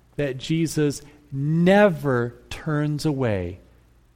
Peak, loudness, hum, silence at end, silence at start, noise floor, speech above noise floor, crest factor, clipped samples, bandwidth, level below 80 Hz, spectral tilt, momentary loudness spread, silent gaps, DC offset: -4 dBFS; -22 LUFS; none; 0.6 s; 0.2 s; -55 dBFS; 33 dB; 18 dB; under 0.1%; 16 kHz; -50 dBFS; -6.5 dB/octave; 15 LU; none; under 0.1%